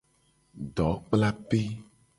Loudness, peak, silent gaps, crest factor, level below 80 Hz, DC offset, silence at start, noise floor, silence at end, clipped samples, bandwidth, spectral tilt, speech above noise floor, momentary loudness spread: -29 LUFS; -10 dBFS; none; 20 dB; -48 dBFS; under 0.1%; 0.55 s; -67 dBFS; 0.35 s; under 0.1%; 11.5 kHz; -7.5 dB/octave; 40 dB; 14 LU